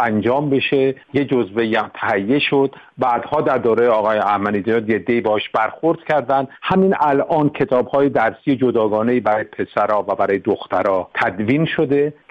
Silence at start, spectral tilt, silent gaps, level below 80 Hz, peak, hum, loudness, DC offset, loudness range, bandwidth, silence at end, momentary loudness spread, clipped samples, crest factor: 0 s; -8 dB/octave; none; -56 dBFS; -4 dBFS; none; -18 LUFS; under 0.1%; 1 LU; 6.6 kHz; 0.2 s; 4 LU; under 0.1%; 12 dB